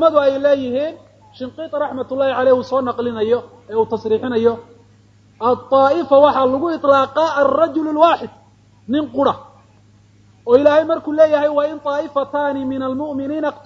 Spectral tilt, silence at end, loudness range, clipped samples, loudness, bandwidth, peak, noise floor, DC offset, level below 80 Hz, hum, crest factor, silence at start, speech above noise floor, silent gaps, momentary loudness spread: -6.5 dB/octave; 0.05 s; 5 LU; under 0.1%; -17 LUFS; 7.2 kHz; 0 dBFS; -50 dBFS; under 0.1%; -56 dBFS; none; 16 dB; 0 s; 34 dB; none; 10 LU